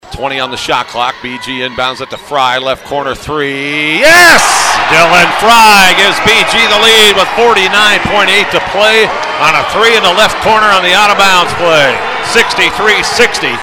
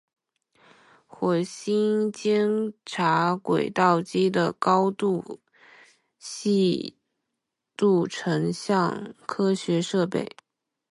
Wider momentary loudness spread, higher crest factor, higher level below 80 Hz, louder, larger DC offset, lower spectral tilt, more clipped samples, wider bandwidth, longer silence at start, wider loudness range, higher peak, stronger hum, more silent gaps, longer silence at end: about the same, 12 LU vs 11 LU; second, 8 dB vs 20 dB; first, -38 dBFS vs -70 dBFS; first, -7 LUFS vs -25 LUFS; neither; second, -2 dB/octave vs -6 dB/octave; first, 3% vs under 0.1%; first, over 20 kHz vs 11.5 kHz; second, 0.05 s vs 1.2 s; first, 8 LU vs 4 LU; first, 0 dBFS vs -6 dBFS; neither; neither; second, 0 s vs 0.7 s